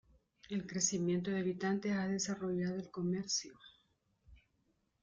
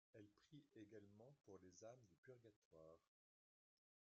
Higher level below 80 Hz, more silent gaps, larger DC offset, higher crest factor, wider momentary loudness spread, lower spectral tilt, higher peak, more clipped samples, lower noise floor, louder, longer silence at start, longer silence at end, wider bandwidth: first, -72 dBFS vs under -90 dBFS; second, none vs 2.18-2.23 s, 2.56-2.71 s; neither; about the same, 18 dB vs 18 dB; about the same, 6 LU vs 5 LU; second, -4 dB/octave vs -6 dB/octave; first, -20 dBFS vs -50 dBFS; neither; second, -79 dBFS vs under -90 dBFS; first, -37 LUFS vs -67 LUFS; first, 0.5 s vs 0.15 s; second, 0.65 s vs 1.15 s; first, 9.6 kHz vs 7 kHz